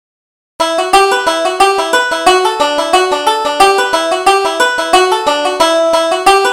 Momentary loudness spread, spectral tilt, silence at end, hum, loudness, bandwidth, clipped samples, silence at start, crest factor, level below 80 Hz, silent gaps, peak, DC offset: 4 LU; -1 dB/octave; 0 s; none; -11 LUFS; 17 kHz; 0.1%; 0.6 s; 12 dB; -44 dBFS; none; 0 dBFS; 0.2%